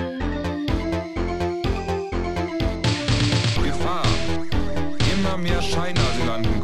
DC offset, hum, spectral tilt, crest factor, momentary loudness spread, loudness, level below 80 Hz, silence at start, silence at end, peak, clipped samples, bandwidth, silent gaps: under 0.1%; none; -5.5 dB/octave; 14 dB; 5 LU; -24 LUFS; -30 dBFS; 0 s; 0 s; -6 dBFS; under 0.1%; 13 kHz; none